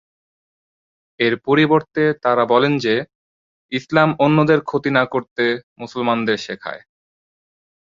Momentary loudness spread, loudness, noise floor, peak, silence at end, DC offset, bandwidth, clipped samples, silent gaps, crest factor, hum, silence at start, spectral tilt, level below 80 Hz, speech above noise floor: 13 LU; -18 LUFS; under -90 dBFS; -2 dBFS; 1.15 s; under 0.1%; 7.6 kHz; under 0.1%; 3.15-3.69 s, 5.31-5.36 s, 5.63-5.76 s; 18 dB; none; 1.2 s; -6.5 dB/octave; -60 dBFS; over 73 dB